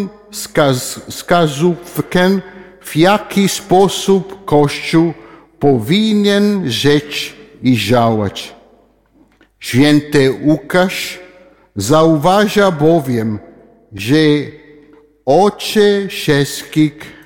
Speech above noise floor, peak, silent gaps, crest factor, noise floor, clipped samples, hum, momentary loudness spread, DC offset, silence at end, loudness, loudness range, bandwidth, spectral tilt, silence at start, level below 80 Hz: 38 dB; 0 dBFS; none; 14 dB; -51 dBFS; under 0.1%; none; 13 LU; under 0.1%; 0.15 s; -13 LUFS; 2 LU; 17.5 kHz; -5.5 dB/octave; 0 s; -46 dBFS